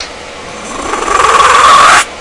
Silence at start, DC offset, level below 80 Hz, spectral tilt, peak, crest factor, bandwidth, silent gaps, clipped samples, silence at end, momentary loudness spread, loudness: 0 s; under 0.1%; -34 dBFS; -1 dB/octave; 0 dBFS; 8 dB; 12 kHz; none; 2%; 0 s; 20 LU; -5 LUFS